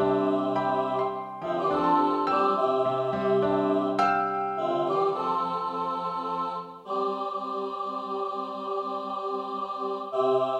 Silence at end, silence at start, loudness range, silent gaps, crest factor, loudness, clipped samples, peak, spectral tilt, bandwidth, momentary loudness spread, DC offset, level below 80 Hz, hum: 0 s; 0 s; 6 LU; none; 16 dB; -27 LUFS; under 0.1%; -12 dBFS; -7 dB/octave; 8.8 kHz; 8 LU; under 0.1%; -66 dBFS; none